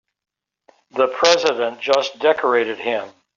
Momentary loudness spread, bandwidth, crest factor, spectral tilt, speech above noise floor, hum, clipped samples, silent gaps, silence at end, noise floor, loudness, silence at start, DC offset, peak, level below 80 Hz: 9 LU; 7.6 kHz; 18 dB; 0 dB/octave; 39 dB; none; under 0.1%; none; 0.25 s; -58 dBFS; -18 LUFS; 0.95 s; under 0.1%; -2 dBFS; -66 dBFS